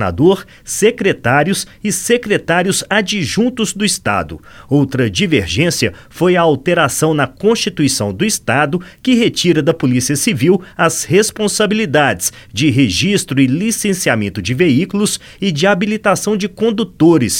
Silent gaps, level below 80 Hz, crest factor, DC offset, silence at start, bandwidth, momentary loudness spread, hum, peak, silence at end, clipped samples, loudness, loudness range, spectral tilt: none; -44 dBFS; 14 dB; under 0.1%; 0 s; 17.5 kHz; 5 LU; none; 0 dBFS; 0 s; under 0.1%; -14 LUFS; 2 LU; -4.5 dB/octave